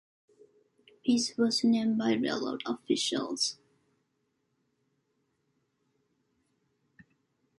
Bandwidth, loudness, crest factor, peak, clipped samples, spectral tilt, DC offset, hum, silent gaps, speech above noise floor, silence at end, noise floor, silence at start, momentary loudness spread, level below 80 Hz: 11.5 kHz; -29 LUFS; 18 dB; -14 dBFS; under 0.1%; -3.5 dB/octave; under 0.1%; none; none; 49 dB; 4.05 s; -78 dBFS; 1.05 s; 8 LU; -78 dBFS